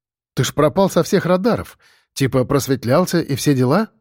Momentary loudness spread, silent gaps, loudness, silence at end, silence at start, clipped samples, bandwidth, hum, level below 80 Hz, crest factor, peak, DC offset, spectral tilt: 7 LU; none; -17 LUFS; 0.15 s; 0.35 s; under 0.1%; 17 kHz; none; -48 dBFS; 14 dB; -4 dBFS; under 0.1%; -6 dB/octave